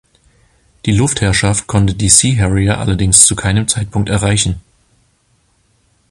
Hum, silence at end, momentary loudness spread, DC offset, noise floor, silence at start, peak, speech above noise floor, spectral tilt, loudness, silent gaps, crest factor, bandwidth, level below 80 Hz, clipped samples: none; 1.5 s; 9 LU; under 0.1%; -57 dBFS; 0.85 s; 0 dBFS; 45 dB; -3.5 dB/octave; -12 LUFS; none; 14 dB; 16 kHz; -30 dBFS; 0.2%